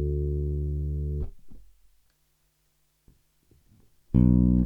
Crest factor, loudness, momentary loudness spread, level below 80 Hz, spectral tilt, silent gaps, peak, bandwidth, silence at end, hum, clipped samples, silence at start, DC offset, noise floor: 18 dB; -26 LUFS; 13 LU; -32 dBFS; -12.5 dB/octave; none; -10 dBFS; 2.3 kHz; 0 s; none; under 0.1%; 0 s; under 0.1%; -70 dBFS